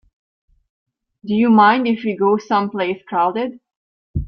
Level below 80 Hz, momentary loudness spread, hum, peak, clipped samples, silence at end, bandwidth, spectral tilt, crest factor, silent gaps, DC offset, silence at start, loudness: -42 dBFS; 14 LU; none; -2 dBFS; under 0.1%; 0 s; 6.4 kHz; -7.5 dB/octave; 18 dB; 3.76-4.14 s; under 0.1%; 1.25 s; -17 LUFS